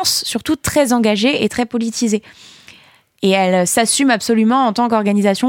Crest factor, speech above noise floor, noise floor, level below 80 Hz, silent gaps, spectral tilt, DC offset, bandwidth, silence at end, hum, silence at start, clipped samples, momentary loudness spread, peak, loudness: 14 dB; 33 dB; -48 dBFS; -50 dBFS; none; -3.5 dB/octave; under 0.1%; 17 kHz; 0 s; none; 0 s; under 0.1%; 6 LU; -2 dBFS; -15 LUFS